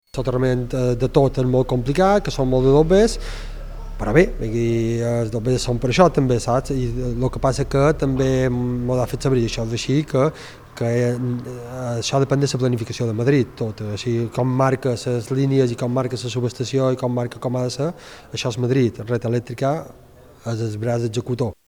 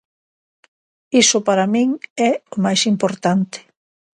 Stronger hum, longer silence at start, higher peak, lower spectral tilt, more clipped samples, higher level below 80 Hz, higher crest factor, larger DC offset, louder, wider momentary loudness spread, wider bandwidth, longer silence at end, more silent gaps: neither; second, 0.15 s vs 1.1 s; about the same, 0 dBFS vs -2 dBFS; first, -6.5 dB/octave vs -3.5 dB/octave; neither; first, -34 dBFS vs -66 dBFS; about the same, 20 dB vs 16 dB; neither; second, -20 LUFS vs -17 LUFS; first, 10 LU vs 7 LU; first, 14 kHz vs 11.5 kHz; second, 0.15 s vs 0.55 s; second, none vs 2.10-2.16 s